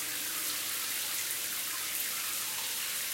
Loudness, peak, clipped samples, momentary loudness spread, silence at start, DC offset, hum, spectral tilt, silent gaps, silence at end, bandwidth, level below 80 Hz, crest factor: -32 LUFS; -18 dBFS; under 0.1%; 1 LU; 0 s; under 0.1%; none; 1.5 dB/octave; none; 0 s; 16.5 kHz; -76 dBFS; 18 dB